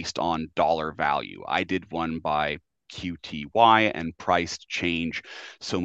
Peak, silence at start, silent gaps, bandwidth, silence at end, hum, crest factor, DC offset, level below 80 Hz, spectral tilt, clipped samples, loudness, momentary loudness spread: -4 dBFS; 0 s; none; 8.4 kHz; 0 s; none; 22 dB; under 0.1%; -56 dBFS; -4.5 dB/octave; under 0.1%; -25 LUFS; 15 LU